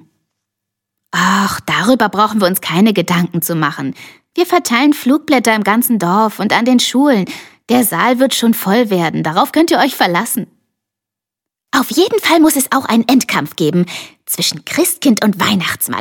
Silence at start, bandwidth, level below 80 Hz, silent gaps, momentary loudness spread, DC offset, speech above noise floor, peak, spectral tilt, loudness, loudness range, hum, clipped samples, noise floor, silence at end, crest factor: 1.15 s; 17.5 kHz; -58 dBFS; none; 7 LU; under 0.1%; 71 dB; 0 dBFS; -4 dB/octave; -13 LUFS; 2 LU; none; under 0.1%; -84 dBFS; 0 s; 14 dB